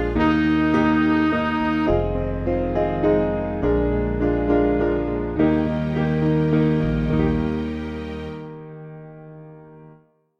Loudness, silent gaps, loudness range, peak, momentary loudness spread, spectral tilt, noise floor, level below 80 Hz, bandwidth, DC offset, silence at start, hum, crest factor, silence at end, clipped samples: -21 LUFS; none; 5 LU; -6 dBFS; 16 LU; -9 dB/octave; -53 dBFS; -34 dBFS; 6.6 kHz; under 0.1%; 0 s; none; 16 dB; 0.5 s; under 0.1%